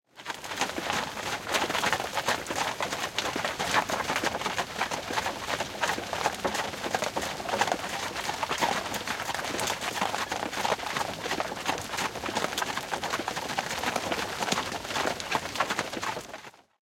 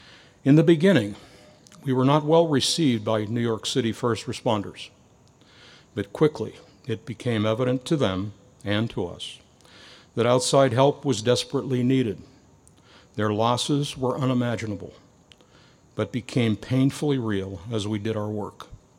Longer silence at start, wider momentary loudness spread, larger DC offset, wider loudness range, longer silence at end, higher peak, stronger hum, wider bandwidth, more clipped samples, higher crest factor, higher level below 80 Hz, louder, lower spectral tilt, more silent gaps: second, 0.15 s vs 0.45 s; second, 4 LU vs 17 LU; neither; second, 2 LU vs 5 LU; about the same, 0.3 s vs 0.25 s; about the same, -6 dBFS vs -4 dBFS; neither; about the same, 17 kHz vs 15.5 kHz; neither; about the same, 24 dB vs 20 dB; about the same, -58 dBFS vs -60 dBFS; second, -30 LUFS vs -24 LUFS; second, -2 dB/octave vs -5.5 dB/octave; neither